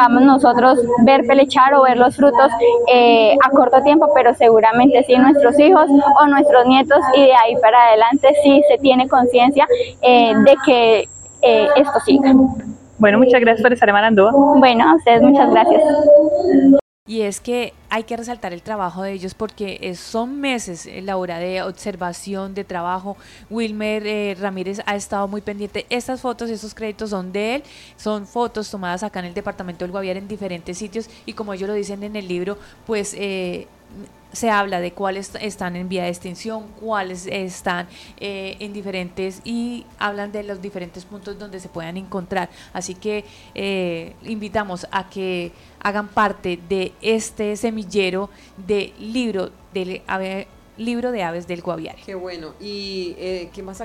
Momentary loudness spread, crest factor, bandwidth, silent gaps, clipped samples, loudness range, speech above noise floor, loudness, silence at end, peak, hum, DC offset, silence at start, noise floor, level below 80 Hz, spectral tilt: 19 LU; 16 dB; 12.5 kHz; 16.81-17.06 s; under 0.1%; 16 LU; 25 dB; -15 LUFS; 0 s; 0 dBFS; none; under 0.1%; 0 s; -41 dBFS; -50 dBFS; -5 dB/octave